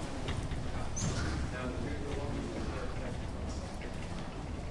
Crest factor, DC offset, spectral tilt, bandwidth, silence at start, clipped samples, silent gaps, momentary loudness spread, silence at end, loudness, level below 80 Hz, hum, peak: 14 dB; under 0.1%; -5 dB/octave; 11.5 kHz; 0 s; under 0.1%; none; 6 LU; 0 s; -39 LUFS; -42 dBFS; none; -22 dBFS